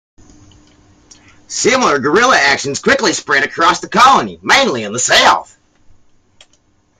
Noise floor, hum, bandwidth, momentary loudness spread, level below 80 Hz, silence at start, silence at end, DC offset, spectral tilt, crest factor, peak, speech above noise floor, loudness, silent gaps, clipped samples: -55 dBFS; none; 16 kHz; 7 LU; -48 dBFS; 1.5 s; 1.55 s; under 0.1%; -2 dB/octave; 14 dB; 0 dBFS; 43 dB; -11 LUFS; none; under 0.1%